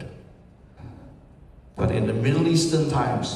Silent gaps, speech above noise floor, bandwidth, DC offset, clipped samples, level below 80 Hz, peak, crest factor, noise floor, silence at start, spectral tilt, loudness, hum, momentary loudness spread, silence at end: none; 28 dB; 13 kHz; under 0.1%; under 0.1%; -48 dBFS; -8 dBFS; 16 dB; -50 dBFS; 0 s; -6 dB/octave; -22 LUFS; none; 23 LU; 0 s